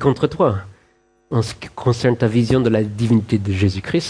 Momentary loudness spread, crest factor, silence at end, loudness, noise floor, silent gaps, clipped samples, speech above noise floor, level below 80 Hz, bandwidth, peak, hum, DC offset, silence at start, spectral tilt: 7 LU; 16 dB; 0 s; -19 LUFS; -58 dBFS; none; under 0.1%; 41 dB; -44 dBFS; 10.5 kHz; -2 dBFS; none; under 0.1%; 0 s; -7 dB/octave